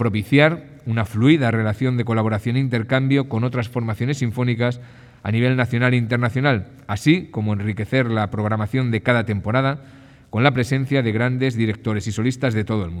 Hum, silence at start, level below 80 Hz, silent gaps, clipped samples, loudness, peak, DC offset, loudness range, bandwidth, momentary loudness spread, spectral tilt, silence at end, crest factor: none; 0 s; -54 dBFS; none; under 0.1%; -20 LUFS; -2 dBFS; under 0.1%; 2 LU; 12.5 kHz; 7 LU; -7 dB/octave; 0 s; 18 dB